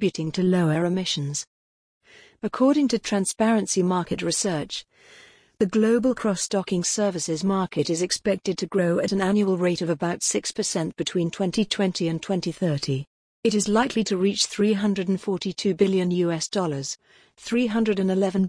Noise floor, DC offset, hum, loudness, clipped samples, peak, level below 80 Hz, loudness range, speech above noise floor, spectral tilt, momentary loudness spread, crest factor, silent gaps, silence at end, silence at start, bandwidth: under -90 dBFS; under 0.1%; none; -24 LUFS; under 0.1%; -8 dBFS; -58 dBFS; 1 LU; over 67 dB; -4.5 dB/octave; 6 LU; 16 dB; 1.47-2.01 s, 13.07-13.43 s; 0 s; 0 s; 10.5 kHz